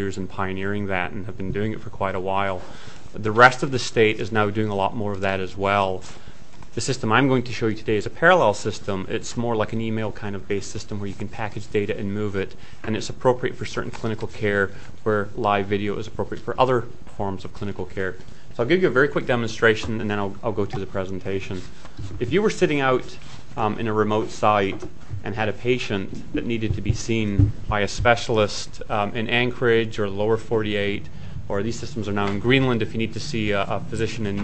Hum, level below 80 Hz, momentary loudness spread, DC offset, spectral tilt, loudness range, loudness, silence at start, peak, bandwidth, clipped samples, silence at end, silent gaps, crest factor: none; -42 dBFS; 12 LU; 3%; -5.5 dB/octave; 5 LU; -23 LUFS; 0 s; 0 dBFS; 8.6 kHz; under 0.1%; 0 s; none; 24 dB